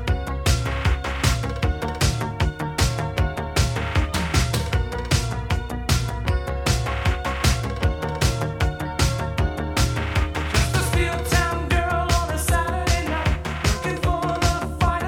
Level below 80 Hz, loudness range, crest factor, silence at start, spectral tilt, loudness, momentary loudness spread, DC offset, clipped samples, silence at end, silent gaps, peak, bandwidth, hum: -26 dBFS; 2 LU; 18 dB; 0 s; -4.5 dB/octave; -23 LUFS; 4 LU; under 0.1%; under 0.1%; 0 s; none; -4 dBFS; 17.5 kHz; none